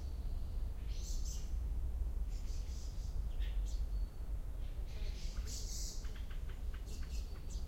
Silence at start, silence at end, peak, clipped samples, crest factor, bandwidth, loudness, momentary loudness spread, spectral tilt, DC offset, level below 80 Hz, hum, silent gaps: 0 s; 0 s; -28 dBFS; under 0.1%; 12 dB; 16.5 kHz; -45 LUFS; 5 LU; -4.5 dB/octave; under 0.1%; -40 dBFS; none; none